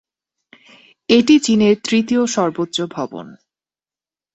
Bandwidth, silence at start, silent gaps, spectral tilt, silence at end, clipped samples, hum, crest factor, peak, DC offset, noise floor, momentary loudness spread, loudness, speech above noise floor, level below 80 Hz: 8.2 kHz; 1.1 s; none; -4.5 dB/octave; 1 s; under 0.1%; none; 16 dB; -2 dBFS; under 0.1%; under -90 dBFS; 16 LU; -16 LUFS; over 74 dB; -58 dBFS